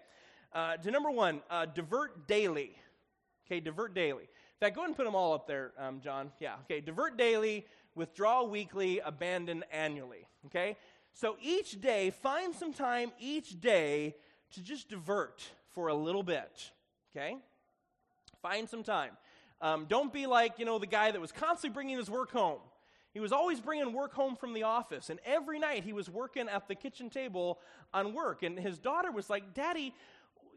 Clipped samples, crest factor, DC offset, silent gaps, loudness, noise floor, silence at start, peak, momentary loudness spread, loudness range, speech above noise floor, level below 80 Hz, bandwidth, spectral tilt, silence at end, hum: under 0.1%; 22 dB; under 0.1%; none; -36 LUFS; -79 dBFS; 0.5 s; -14 dBFS; 13 LU; 6 LU; 44 dB; -78 dBFS; 11.5 kHz; -4.5 dB/octave; 0.5 s; none